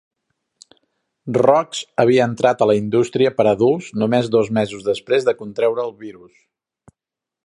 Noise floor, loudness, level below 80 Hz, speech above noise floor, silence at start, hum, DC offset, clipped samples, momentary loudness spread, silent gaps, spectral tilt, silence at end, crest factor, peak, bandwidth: -86 dBFS; -18 LUFS; -60 dBFS; 69 dB; 1.25 s; none; under 0.1%; under 0.1%; 9 LU; none; -6 dB/octave; 1.35 s; 18 dB; 0 dBFS; 11 kHz